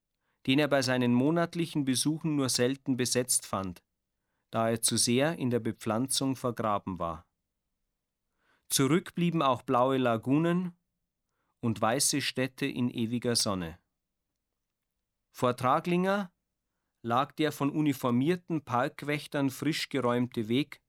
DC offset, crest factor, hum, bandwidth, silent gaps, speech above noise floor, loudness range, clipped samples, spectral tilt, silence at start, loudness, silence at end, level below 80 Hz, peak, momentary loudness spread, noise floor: under 0.1%; 20 dB; none; over 20 kHz; none; 57 dB; 4 LU; under 0.1%; -4.5 dB/octave; 0.45 s; -29 LUFS; 0.15 s; -66 dBFS; -12 dBFS; 8 LU; -86 dBFS